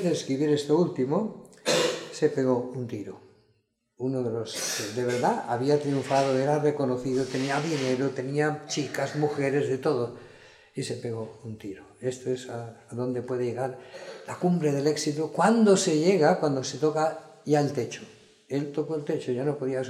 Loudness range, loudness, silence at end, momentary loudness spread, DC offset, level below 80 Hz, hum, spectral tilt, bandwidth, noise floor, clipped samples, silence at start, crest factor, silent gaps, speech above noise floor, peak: 9 LU; -27 LUFS; 0 s; 13 LU; under 0.1%; -70 dBFS; none; -5 dB/octave; 15 kHz; -70 dBFS; under 0.1%; 0 s; 20 dB; none; 44 dB; -8 dBFS